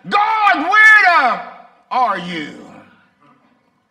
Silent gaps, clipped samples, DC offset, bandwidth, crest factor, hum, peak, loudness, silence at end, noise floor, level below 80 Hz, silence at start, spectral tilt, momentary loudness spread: none; under 0.1%; under 0.1%; 15 kHz; 16 dB; none; 0 dBFS; -11 LUFS; 1.3 s; -58 dBFS; -66 dBFS; 0.05 s; -3.5 dB/octave; 19 LU